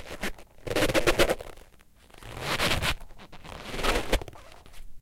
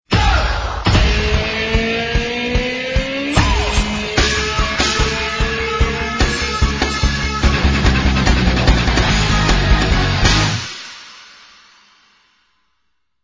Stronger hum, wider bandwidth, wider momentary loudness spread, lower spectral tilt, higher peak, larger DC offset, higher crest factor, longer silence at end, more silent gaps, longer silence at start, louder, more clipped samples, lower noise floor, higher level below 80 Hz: neither; first, 17 kHz vs 8 kHz; first, 21 LU vs 5 LU; about the same, -3.5 dB/octave vs -4.5 dB/octave; second, -8 dBFS vs 0 dBFS; neither; first, 22 dB vs 16 dB; second, 0 s vs 2 s; neither; about the same, 0 s vs 0.1 s; second, -28 LUFS vs -16 LUFS; neither; second, -55 dBFS vs -71 dBFS; second, -38 dBFS vs -20 dBFS